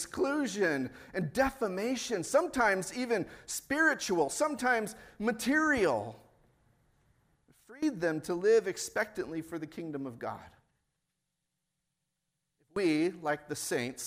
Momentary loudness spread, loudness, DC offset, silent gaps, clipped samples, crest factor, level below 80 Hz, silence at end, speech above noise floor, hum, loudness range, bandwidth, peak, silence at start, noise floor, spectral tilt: 12 LU; -32 LUFS; under 0.1%; none; under 0.1%; 18 dB; -64 dBFS; 0 s; 53 dB; none; 10 LU; 16 kHz; -14 dBFS; 0 s; -85 dBFS; -4 dB/octave